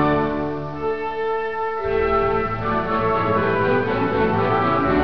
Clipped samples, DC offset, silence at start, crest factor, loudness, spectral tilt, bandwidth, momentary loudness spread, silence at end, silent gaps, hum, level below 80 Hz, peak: under 0.1%; 1%; 0 s; 14 dB; -21 LUFS; -8.5 dB/octave; 5.4 kHz; 6 LU; 0 s; none; none; -40 dBFS; -6 dBFS